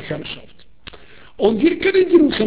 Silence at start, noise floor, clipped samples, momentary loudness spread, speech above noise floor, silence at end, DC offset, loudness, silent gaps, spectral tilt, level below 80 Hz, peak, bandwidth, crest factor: 0 s; -41 dBFS; under 0.1%; 17 LU; 25 dB; 0 s; 0.8%; -16 LUFS; none; -10 dB/octave; -48 dBFS; -2 dBFS; 4 kHz; 16 dB